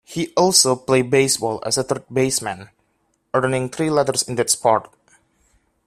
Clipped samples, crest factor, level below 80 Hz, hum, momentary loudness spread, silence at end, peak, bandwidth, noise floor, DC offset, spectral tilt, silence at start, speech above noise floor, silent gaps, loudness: under 0.1%; 20 dB; -58 dBFS; none; 9 LU; 1.05 s; 0 dBFS; 15.5 kHz; -67 dBFS; under 0.1%; -3 dB/octave; 0.1 s; 48 dB; none; -18 LUFS